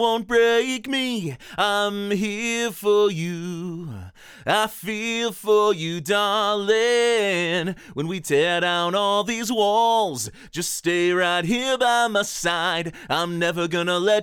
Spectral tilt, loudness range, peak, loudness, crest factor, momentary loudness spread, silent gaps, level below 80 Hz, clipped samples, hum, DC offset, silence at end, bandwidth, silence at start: -3.5 dB/octave; 3 LU; -6 dBFS; -22 LUFS; 16 dB; 10 LU; none; -58 dBFS; under 0.1%; none; under 0.1%; 0 s; over 20 kHz; 0 s